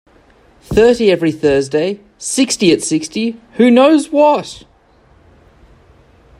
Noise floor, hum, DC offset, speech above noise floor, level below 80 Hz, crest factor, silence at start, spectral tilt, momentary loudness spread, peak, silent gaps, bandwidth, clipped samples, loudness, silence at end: -49 dBFS; none; under 0.1%; 37 dB; -44 dBFS; 14 dB; 0.7 s; -4.5 dB/octave; 11 LU; 0 dBFS; none; 13.5 kHz; under 0.1%; -13 LUFS; 1.8 s